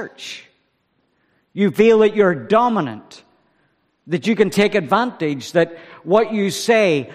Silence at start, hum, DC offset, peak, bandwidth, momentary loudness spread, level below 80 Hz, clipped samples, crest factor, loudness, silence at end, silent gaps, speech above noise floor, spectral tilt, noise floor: 0 s; none; under 0.1%; 0 dBFS; 15 kHz; 19 LU; -60 dBFS; under 0.1%; 18 dB; -17 LUFS; 0 s; none; 49 dB; -5.5 dB/octave; -66 dBFS